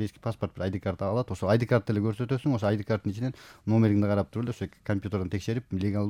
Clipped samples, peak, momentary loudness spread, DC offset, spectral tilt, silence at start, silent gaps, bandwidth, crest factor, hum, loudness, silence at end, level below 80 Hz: under 0.1%; -10 dBFS; 9 LU; under 0.1%; -8 dB/octave; 0 s; none; 11.5 kHz; 18 dB; none; -29 LUFS; 0 s; -60 dBFS